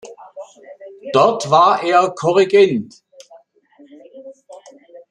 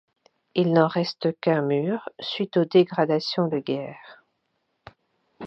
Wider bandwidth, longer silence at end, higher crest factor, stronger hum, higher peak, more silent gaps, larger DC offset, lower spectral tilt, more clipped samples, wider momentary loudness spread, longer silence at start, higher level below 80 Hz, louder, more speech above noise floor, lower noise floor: first, 10 kHz vs 6.6 kHz; first, 0.15 s vs 0 s; second, 16 dB vs 22 dB; neither; about the same, -2 dBFS vs -4 dBFS; neither; neither; second, -5 dB/octave vs -7.5 dB/octave; neither; first, 24 LU vs 10 LU; second, 0.05 s vs 0.55 s; first, -66 dBFS vs -72 dBFS; first, -14 LUFS vs -24 LUFS; second, 36 dB vs 51 dB; second, -50 dBFS vs -74 dBFS